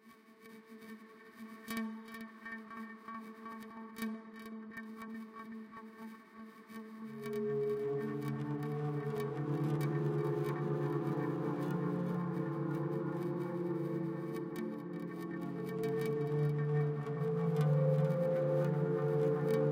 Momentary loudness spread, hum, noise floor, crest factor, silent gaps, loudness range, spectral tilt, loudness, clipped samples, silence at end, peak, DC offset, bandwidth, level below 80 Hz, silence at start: 18 LU; none; -59 dBFS; 16 dB; none; 13 LU; -8.5 dB/octave; -37 LUFS; under 0.1%; 0 s; -22 dBFS; under 0.1%; 16 kHz; -76 dBFS; 0.05 s